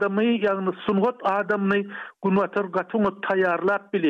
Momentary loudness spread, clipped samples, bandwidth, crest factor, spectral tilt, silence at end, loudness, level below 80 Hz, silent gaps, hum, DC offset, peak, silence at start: 4 LU; under 0.1%; 6.2 kHz; 12 dB; -8.5 dB/octave; 0 s; -23 LUFS; -66 dBFS; none; none; under 0.1%; -10 dBFS; 0 s